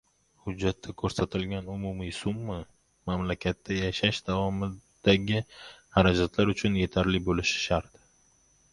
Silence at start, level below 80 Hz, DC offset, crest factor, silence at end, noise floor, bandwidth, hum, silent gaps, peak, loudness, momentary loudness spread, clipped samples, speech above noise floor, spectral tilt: 0.45 s; -44 dBFS; under 0.1%; 24 dB; 0.9 s; -64 dBFS; 11.5 kHz; none; none; -6 dBFS; -28 LUFS; 11 LU; under 0.1%; 36 dB; -5.5 dB/octave